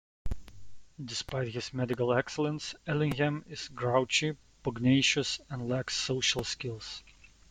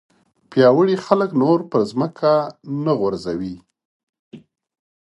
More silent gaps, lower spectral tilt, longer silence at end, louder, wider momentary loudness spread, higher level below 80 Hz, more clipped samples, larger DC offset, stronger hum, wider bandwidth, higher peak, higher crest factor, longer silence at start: second, none vs 3.85-4.13 s, 4.19-4.31 s; second, -4 dB/octave vs -7.5 dB/octave; second, 0.4 s vs 0.8 s; second, -31 LUFS vs -19 LUFS; about the same, 15 LU vs 13 LU; first, -52 dBFS vs -58 dBFS; neither; neither; neither; first, 15.5 kHz vs 11 kHz; second, -12 dBFS vs 0 dBFS; about the same, 20 dB vs 20 dB; second, 0.25 s vs 0.5 s